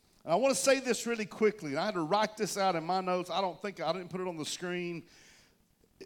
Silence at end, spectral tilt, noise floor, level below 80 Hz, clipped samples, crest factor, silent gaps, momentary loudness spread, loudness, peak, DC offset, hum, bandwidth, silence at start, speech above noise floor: 0 s; -3.5 dB/octave; -68 dBFS; -74 dBFS; under 0.1%; 18 dB; none; 9 LU; -32 LUFS; -14 dBFS; under 0.1%; none; 17.5 kHz; 0.25 s; 36 dB